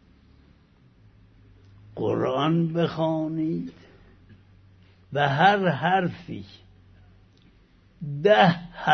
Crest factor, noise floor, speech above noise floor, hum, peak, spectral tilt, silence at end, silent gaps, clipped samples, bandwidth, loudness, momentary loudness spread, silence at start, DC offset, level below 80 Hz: 20 dB; -57 dBFS; 34 dB; none; -6 dBFS; -7.5 dB/octave; 0 s; none; under 0.1%; 6.4 kHz; -23 LUFS; 20 LU; 1.95 s; under 0.1%; -60 dBFS